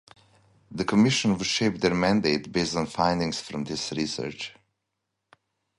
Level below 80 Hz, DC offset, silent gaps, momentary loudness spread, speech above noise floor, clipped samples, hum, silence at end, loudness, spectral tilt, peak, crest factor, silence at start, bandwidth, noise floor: -54 dBFS; under 0.1%; none; 10 LU; 56 dB; under 0.1%; none; 1.25 s; -25 LUFS; -4.5 dB/octave; -8 dBFS; 20 dB; 0.7 s; 11.5 kHz; -81 dBFS